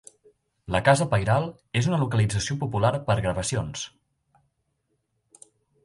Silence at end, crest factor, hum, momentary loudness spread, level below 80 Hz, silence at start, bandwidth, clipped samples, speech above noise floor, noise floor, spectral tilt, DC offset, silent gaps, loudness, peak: 1.95 s; 22 dB; none; 9 LU; -48 dBFS; 0.7 s; 11.5 kHz; under 0.1%; 51 dB; -75 dBFS; -5.5 dB/octave; under 0.1%; none; -25 LUFS; -4 dBFS